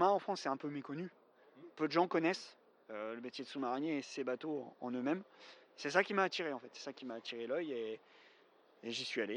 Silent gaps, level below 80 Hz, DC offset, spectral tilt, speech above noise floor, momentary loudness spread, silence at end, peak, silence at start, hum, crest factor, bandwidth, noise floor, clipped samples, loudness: none; under -90 dBFS; under 0.1%; -4.5 dB/octave; 29 dB; 17 LU; 0 s; -14 dBFS; 0 s; none; 24 dB; 10.5 kHz; -68 dBFS; under 0.1%; -39 LUFS